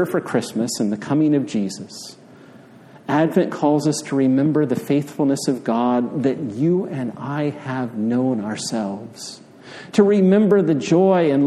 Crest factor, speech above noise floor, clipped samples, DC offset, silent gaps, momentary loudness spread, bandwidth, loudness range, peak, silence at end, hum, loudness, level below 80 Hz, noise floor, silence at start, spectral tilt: 16 dB; 26 dB; under 0.1%; under 0.1%; none; 17 LU; 14.5 kHz; 4 LU; -2 dBFS; 0 s; none; -19 LUFS; -66 dBFS; -45 dBFS; 0 s; -6.5 dB/octave